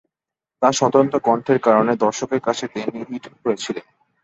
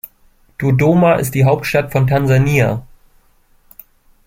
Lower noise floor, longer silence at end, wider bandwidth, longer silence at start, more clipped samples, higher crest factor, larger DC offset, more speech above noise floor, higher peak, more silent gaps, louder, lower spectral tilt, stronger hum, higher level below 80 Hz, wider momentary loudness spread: first, -87 dBFS vs -52 dBFS; second, 0.4 s vs 1.45 s; second, 8.4 kHz vs 16.5 kHz; about the same, 0.6 s vs 0.6 s; neither; about the same, 18 dB vs 14 dB; neither; first, 68 dB vs 39 dB; about the same, -2 dBFS vs -2 dBFS; neither; second, -19 LUFS vs -14 LUFS; second, -5 dB/octave vs -7 dB/octave; neither; second, -64 dBFS vs -40 dBFS; about the same, 12 LU vs 12 LU